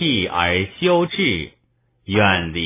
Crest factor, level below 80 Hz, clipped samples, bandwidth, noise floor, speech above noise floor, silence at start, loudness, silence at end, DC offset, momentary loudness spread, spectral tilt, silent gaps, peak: 18 dB; -40 dBFS; under 0.1%; 3.9 kHz; -63 dBFS; 44 dB; 0 s; -18 LUFS; 0 s; under 0.1%; 7 LU; -9 dB/octave; none; -2 dBFS